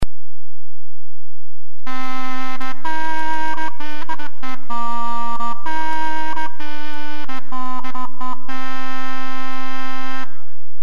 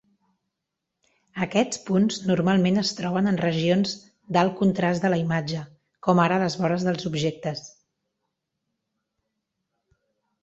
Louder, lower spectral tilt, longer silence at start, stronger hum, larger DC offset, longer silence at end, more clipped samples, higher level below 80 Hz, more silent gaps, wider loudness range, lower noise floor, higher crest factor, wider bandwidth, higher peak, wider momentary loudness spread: second, -27 LUFS vs -24 LUFS; about the same, -5.5 dB/octave vs -6 dB/octave; second, 0 s vs 1.35 s; neither; first, 50% vs under 0.1%; second, 0.2 s vs 2.75 s; neither; first, -44 dBFS vs -62 dBFS; neither; second, 4 LU vs 8 LU; second, -50 dBFS vs -83 dBFS; about the same, 22 dB vs 20 dB; first, 13.5 kHz vs 8.2 kHz; about the same, -4 dBFS vs -6 dBFS; second, 8 LU vs 11 LU